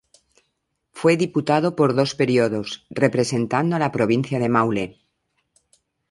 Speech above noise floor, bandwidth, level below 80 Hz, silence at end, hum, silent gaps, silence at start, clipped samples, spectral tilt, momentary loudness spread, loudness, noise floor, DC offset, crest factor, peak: 55 dB; 11.5 kHz; -60 dBFS; 1.2 s; none; none; 0.95 s; under 0.1%; -6 dB/octave; 4 LU; -21 LUFS; -74 dBFS; under 0.1%; 20 dB; -2 dBFS